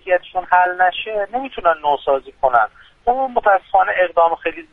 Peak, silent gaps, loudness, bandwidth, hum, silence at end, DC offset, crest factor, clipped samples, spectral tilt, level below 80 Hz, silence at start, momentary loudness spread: 0 dBFS; none; -17 LUFS; 4 kHz; none; 0.1 s; under 0.1%; 16 dB; under 0.1%; -5.5 dB/octave; -50 dBFS; 0.05 s; 8 LU